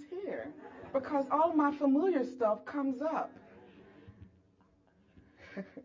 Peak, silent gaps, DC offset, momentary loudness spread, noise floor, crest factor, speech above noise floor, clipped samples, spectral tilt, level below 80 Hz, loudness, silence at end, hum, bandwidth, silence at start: -16 dBFS; none; under 0.1%; 18 LU; -68 dBFS; 18 dB; 36 dB; under 0.1%; -7.5 dB/octave; -70 dBFS; -32 LUFS; 0.05 s; none; 7.4 kHz; 0 s